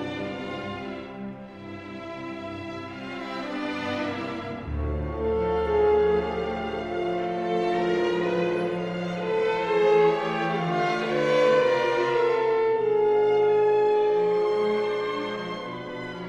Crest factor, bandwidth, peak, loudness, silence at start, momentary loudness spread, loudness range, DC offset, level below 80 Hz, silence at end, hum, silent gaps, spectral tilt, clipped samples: 14 dB; 8.2 kHz; -10 dBFS; -25 LUFS; 0 s; 14 LU; 11 LU; under 0.1%; -44 dBFS; 0 s; none; none; -6.5 dB/octave; under 0.1%